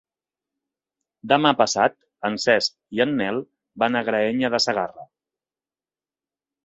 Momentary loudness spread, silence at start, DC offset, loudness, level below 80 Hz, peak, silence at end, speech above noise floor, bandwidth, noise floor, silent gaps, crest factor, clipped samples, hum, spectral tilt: 10 LU; 1.25 s; under 0.1%; -22 LUFS; -64 dBFS; -2 dBFS; 1.6 s; over 69 dB; 8.2 kHz; under -90 dBFS; none; 22 dB; under 0.1%; none; -3.5 dB/octave